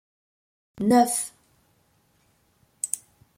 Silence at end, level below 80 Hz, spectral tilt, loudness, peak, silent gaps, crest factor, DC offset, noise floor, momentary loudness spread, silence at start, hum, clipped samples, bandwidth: 0.4 s; -68 dBFS; -4 dB/octave; -24 LUFS; -6 dBFS; none; 22 dB; under 0.1%; -65 dBFS; 14 LU; 0.75 s; none; under 0.1%; 16.5 kHz